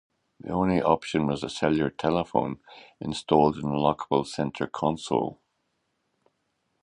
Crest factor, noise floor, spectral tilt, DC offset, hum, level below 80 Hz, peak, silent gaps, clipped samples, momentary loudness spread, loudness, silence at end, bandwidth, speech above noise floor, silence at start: 22 dB; -76 dBFS; -6.5 dB/octave; under 0.1%; none; -54 dBFS; -6 dBFS; none; under 0.1%; 12 LU; -26 LUFS; 1.5 s; 10.5 kHz; 50 dB; 0.45 s